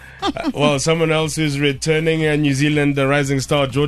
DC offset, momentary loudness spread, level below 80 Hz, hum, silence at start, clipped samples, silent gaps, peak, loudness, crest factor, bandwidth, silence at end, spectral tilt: under 0.1%; 3 LU; -44 dBFS; none; 0 s; under 0.1%; none; -2 dBFS; -17 LUFS; 14 dB; 13 kHz; 0 s; -5 dB/octave